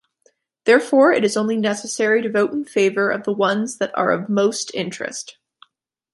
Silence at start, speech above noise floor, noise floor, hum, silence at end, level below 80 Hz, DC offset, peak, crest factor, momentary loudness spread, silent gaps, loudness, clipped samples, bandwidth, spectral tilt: 0.65 s; 51 dB; -69 dBFS; none; 0.85 s; -70 dBFS; under 0.1%; -2 dBFS; 18 dB; 11 LU; none; -19 LUFS; under 0.1%; 11.5 kHz; -4 dB/octave